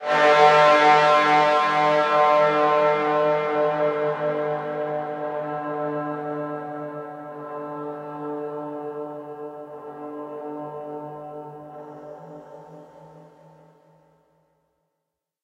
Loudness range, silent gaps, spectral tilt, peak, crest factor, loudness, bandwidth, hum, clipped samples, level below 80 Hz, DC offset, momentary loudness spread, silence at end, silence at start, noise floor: 21 LU; none; -5 dB/octave; -4 dBFS; 20 dB; -20 LUFS; 10 kHz; none; under 0.1%; -76 dBFS; under 0.1%; 23 LU; 2.2 s; 0 s; -82 dBFS